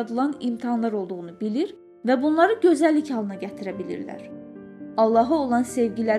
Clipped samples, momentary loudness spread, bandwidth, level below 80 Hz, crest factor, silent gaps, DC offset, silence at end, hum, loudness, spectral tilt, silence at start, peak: under 0.1%; 16 LU; 12.5 kHz; -64 dBFS; 18 dB; none; under 0.1%; 0 s; none; -23 LUFS; -6 dB/octave; 0 s; -4 dBFS